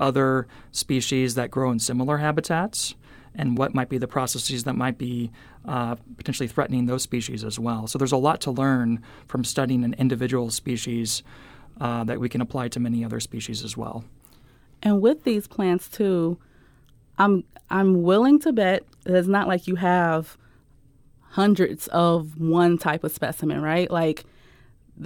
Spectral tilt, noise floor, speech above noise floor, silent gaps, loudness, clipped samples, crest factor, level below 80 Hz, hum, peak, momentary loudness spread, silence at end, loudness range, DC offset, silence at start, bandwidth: -5.5 dB/octave; -55 dBFS; 32 dB; none; -24 LUFS; under 0.1%; 18 dB; -54 dBFS; none; -6 dBFS; 11 LU; 0 s; 6 LU; under 0.1%; 0 s; 19 kHz